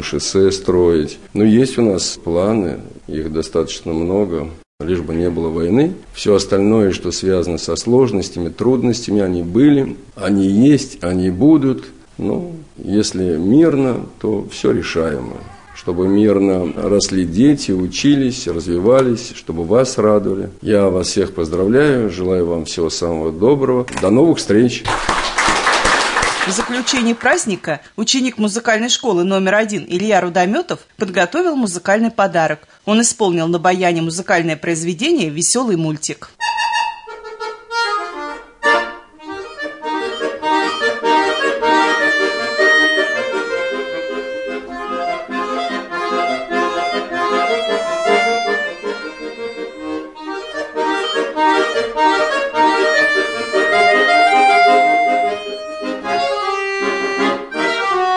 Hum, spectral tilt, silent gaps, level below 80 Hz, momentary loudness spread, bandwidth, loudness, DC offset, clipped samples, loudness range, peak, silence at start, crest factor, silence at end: none; -4.5 dB/octave; 4.66-4.78 s; -44 dBFS; 12 LU; 11 kHz; -16 LUFS; 0.1%; under 0.1%; 6 LU; -2 dBFS; 0 s; 14 dB; 0 s